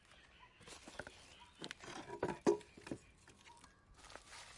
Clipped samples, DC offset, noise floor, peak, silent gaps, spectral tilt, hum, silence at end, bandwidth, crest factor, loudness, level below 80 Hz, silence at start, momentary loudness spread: under 0.1%; under 0.1%; -64 dBFS; -20 dBFS; none; -4.5 dB/octave; none; 0 s; 11.5 kHz; 26 dB; -45 LUFS; -72 dBFS; 0.1 s; 25 LU